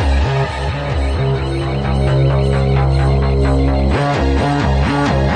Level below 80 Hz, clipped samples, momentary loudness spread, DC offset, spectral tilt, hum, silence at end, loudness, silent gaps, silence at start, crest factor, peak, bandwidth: -20 dBFS; under 0.1%; 4 LU; under 0.1%; -7.5 dB/octave; none; 0 s; -16 LUFS; none; 0 s; 10 dB; -4 dBFS; 9.2 kHz